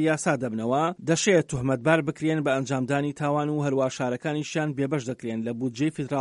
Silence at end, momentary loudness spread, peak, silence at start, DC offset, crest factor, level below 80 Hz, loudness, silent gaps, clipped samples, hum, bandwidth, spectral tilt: 0 s; 7 LU; -6 dBFS; 0 s; under 0.1%; 18 dB; -60 dBFS; -26 LUFS; none; under 0.1%; none; 11 kHz; -5.5 dB/octave